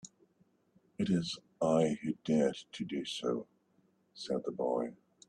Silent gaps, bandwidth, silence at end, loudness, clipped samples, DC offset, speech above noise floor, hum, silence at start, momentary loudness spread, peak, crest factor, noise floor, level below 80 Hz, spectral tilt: none; 10.5 kHz; 0.35 s; -35 LUFS; under 0.1%; under 0.1%; 38 dB; none; 0.05 s; 12 LU; -18 dBFS; 18 dB; -72 dBFS; -72 dBFS; -6 dB/octave